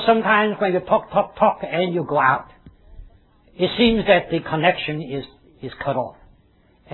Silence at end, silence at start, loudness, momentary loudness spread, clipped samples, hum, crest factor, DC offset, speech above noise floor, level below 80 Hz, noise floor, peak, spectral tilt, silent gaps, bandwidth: 0.8 s; 0 s; -20 LUFS; 14 LU; under 0.1%; none; 20 dB; under 0.1%; 37 dB; -46 dBFS; -56 dBFS; -2 dBFS; -9 dB/octave; none; 4.3 kHz